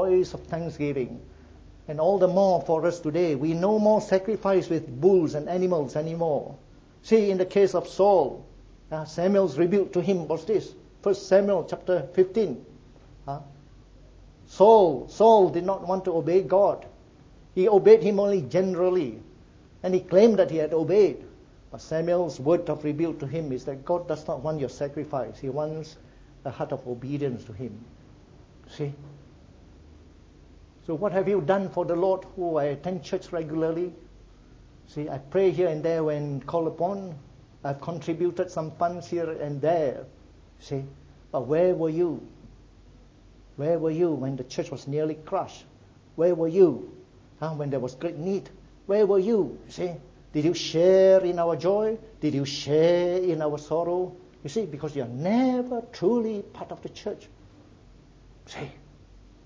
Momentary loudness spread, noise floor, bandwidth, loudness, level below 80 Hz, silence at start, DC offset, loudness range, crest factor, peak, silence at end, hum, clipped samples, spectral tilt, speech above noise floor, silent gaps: 16 LU; -52 dBFS; 7.6 kHz; -25 LUFS; -56 dBFS; 0 s; under 0.1%; 9 LU; 22 dB; -4 dBFS; 0.75 s; none; under 0.1%; -7 dB/octave; 28 dB; none